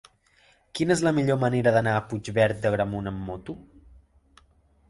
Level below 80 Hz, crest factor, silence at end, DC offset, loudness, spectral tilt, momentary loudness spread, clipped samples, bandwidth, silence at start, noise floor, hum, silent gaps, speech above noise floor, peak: -52 dBFS; 20 dB; 1.25 s; under 0.1%; -25 LUFS; -6 dB/octave; 16 LU; under 0.1%; 11.5 kHz; 0.75 s; -61 dBFS; none; none; 37 dB; -8 dBFS